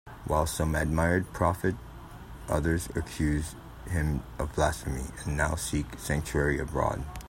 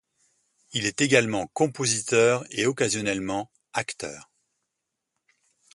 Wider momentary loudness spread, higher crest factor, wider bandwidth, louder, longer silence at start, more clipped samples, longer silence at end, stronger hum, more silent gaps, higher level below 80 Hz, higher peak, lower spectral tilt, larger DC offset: second, 9 LU vs 12 LU; about the same, 20 dB vs 24 dB; first, 16 kHz vs 11.5 kHz; second, -30 LUFS vs -25 LUFS; second, 0.05 s vs 0.7 s; neither; second, 0 s vs 1.5 s; neither; neither; first, -40 dBFS vs -62 dBFS; second, -10 dBFS vs -4 dBFS; first, -5.5 dB/octave vs -3.5 dB/octave; neither